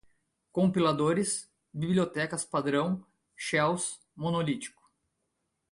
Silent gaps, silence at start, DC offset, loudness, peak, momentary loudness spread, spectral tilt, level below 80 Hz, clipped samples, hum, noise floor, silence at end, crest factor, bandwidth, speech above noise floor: none; 0.55 s; under 0.1%; -30 LUFS; -14 dBFS; 11 LU; -5 dB/octave; -66 dBFS; under 0.1%; none; -81 dBFS; 1.05 s; 18 dB; 11.5 kHz; 52 dB